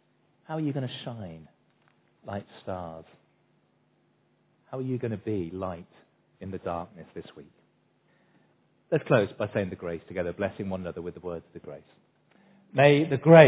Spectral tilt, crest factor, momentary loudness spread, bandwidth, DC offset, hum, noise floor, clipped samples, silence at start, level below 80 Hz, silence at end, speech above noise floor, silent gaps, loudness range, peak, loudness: -6 dB/octave; 26 dB; 22 LU; 4 kHz; under 0.1%; none; -68 dBFS; under 0.1%; 0.5 s; -58 dBFS; 0 s; 42 dB; none; 12 LU; -2 dBFS; -29 LUFS